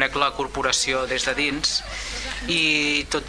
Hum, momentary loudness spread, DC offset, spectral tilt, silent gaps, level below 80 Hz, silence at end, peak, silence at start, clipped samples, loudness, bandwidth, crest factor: none; 10 LU; under 0.1%; -1.5 dB/octave; none; -40 dBFS; 0 s; -2 dBFS; 0 s; under 0.1%; -22 LUFS; 11 kHz; 20 dB